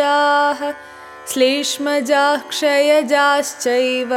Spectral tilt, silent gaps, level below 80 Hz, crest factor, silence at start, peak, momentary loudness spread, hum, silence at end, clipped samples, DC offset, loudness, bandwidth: -1 dB/octave; none; -68 dBFS; 14 dB; 0 s; -4 dBFS; 11 LU; none; 0 s; under 0.1%; under 0.1%; -16 LUFS; 17 kHz